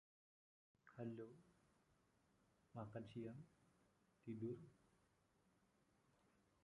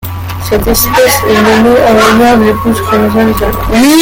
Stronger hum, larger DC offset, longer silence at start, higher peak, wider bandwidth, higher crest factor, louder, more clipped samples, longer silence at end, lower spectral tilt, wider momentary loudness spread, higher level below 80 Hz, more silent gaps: neither; neither; first, 0.85 s vs 0 s; second, -38 dBFS vs 0 dBFS; second, 11 kHz vs 17.5 kHz; first, 20 dB vs 8 dB; second, -56 LUFS vs -7 LUFS; second, under 0.1% vs 0.2%; first, 1.9 s vs 0 s; first, -8.5 dB/octave vs -4.5 dB/octave; first, 13 LU vs 7 LU; second, -86 dBFS vs -24 dBFS; neither